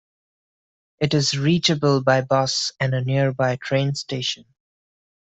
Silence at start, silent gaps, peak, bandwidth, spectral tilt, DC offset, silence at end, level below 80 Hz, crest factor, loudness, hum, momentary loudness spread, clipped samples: 1 s; none; -4 dBFS; 8.2 kHz; -5 dB/octave; under 0.1%; 0.95 s; -58 dBFS; 18 dB; -21 LUFS; none; 7 LU; under 0.1%